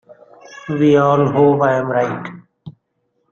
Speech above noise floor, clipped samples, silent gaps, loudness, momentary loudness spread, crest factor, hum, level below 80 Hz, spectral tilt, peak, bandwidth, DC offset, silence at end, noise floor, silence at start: 54 dB; under 0.1%; none; -15 LUFS; 16 LU; 16 dB; none; -58 dBFS; -8 dB/octave; -2 dBFS; 7.2 kHz; under 0.1%; 0.6 s; -68 dBFS; 0.5 s